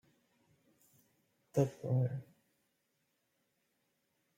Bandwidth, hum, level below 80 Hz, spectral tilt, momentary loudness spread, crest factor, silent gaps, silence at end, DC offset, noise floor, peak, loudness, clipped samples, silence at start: 15.5 kHz; none; -78 dBFS; -8.5 dB/octave; 5 LU; 24 dB; none; 2.15 s; under 0.1%; -81 dBFS; -18 dBFS; -37 LUFS; under 0.1%; 1.55 s